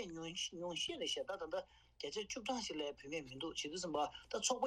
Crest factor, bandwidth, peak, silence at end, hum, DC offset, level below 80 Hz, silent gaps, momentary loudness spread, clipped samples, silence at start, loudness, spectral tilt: 22 dB; 13.5 kHz; -22 dBFS; 0 s; none; under 0.1%; -70 dBFS; none; 7 LU; under 0.1%; 0 s; -43 LUFS; -2 dB/octave